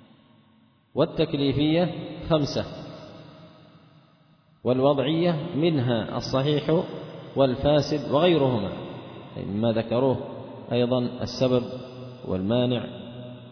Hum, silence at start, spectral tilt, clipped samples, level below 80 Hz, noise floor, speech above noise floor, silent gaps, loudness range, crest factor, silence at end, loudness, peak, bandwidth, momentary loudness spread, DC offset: none; 0.95 s; -7.5 dB/octave; under 0.1%; -52 dBFS; -60 dBFS; 36 dB; none; 4 LU; 18 dB; 0 s; -25 LUFS; -8 dBFS; 5.4 kHz; 17 LU; under 0.1%